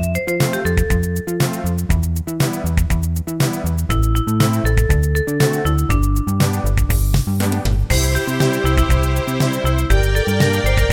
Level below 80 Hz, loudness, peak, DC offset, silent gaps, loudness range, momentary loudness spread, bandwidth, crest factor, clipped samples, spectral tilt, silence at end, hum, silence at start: -20 dBFS; -18 LUFS; -2 dBFS; under 0.1%; none; 2 LU; 4 LU; 18 kHz; 14 dB; under 0.1%; -5.5 dB/octave; 0 s; none; 0 s